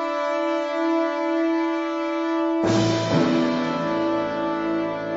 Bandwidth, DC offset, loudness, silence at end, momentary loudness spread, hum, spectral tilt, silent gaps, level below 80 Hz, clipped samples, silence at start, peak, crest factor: 7.8 kHz; under 0.1%; -23 LUFS; 0 s; 5 LU; none; -6 dB/octave; none; -58 dBFS; under 0.1%; 0 s; -8 dBFS; 14 dB